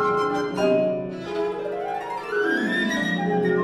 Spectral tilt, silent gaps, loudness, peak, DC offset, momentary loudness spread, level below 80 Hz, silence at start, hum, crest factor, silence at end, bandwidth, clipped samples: -6 dB/octave; none; -24 LUFS; -10 dBFS; under 0.1%; 7 LU; -58 dBFS; 0 s; none; 14 dB; 0 s; 13 kHz; under 0.1%